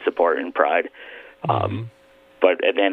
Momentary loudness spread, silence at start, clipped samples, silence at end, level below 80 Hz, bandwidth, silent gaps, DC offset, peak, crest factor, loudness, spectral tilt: 18 LU; 0 s; under 0.1%; 0 s; -64 dBFS; 4.5 kHz; none; under 0.1%; 0 dBFS; 22 dB; -21 LUFS; -8 dB/octave